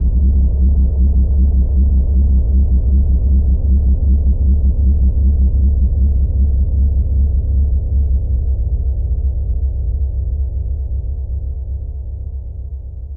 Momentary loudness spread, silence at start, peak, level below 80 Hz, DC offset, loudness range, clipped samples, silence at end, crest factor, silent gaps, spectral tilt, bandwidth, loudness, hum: 10 LU; 0 s; -6 dBFS; -14 dBFS; under 0.1%; 7 LU; under 0.1%; 0 s; 6 dB; none; -15 dB/octave; 0.9 kHz; -16 LUFS; none